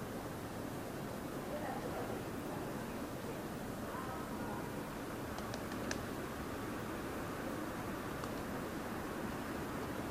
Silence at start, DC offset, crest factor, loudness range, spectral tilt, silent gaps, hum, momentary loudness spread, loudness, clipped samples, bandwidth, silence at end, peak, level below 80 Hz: 0 s; under 0.1%; 20 dB; 1 LU; -5 dB/octave; none; none; 2 LU; -43 LUFS; under 0.1%; 15.5 kHz; 0 s; -22 dBFS; -58 dBFS